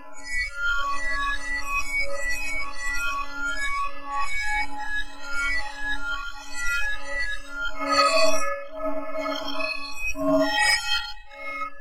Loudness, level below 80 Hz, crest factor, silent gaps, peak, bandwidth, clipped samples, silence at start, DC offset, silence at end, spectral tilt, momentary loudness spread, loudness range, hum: -26 LUFS; -38 dBFS; 18 dB; none; -6 dBFS; 15.5 kHz; under 0.1%; 0 s; 3%; 0 s; -2 dB/octave; 11 LU; 4 LU; none